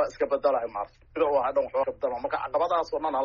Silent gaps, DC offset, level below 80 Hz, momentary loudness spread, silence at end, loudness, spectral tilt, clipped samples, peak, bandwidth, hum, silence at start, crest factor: none; under 0.1%; -58 dBFS; 7 LU; 0 s; -27 LUFS; -3 dB/octave; under 0.1%; -12 dBFS; 7.2 kHz; none; 0 s; 16 dB